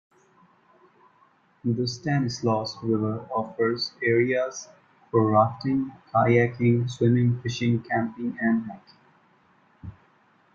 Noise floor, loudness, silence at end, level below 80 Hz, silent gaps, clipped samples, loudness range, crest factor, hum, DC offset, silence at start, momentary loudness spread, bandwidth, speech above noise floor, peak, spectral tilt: -61 dBFS; -25 LUFS; 0.65 s; -62 dBFS; none; under 0.1%; 5 LU; 20 dB; none; under 0.1%; 1.65 s; 11 LU; 7.4 kHz; 37 dB; -6 dBFS; -6.5 dB/octave